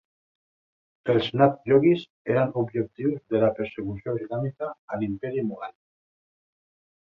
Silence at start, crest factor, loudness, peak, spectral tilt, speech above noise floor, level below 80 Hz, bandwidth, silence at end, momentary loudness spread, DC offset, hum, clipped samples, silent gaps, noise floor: 1.05 s; 20 dB; -25 LUFS; -6 dBFS; -9 dB/octave; over 65 dB; -60 dBFS; 6 kHz; 1.3 s; 13 LU; under 0.1%; none; under 0.1%; 2.10-2.25 s, 4.79-4.88 s; under -90 dBFS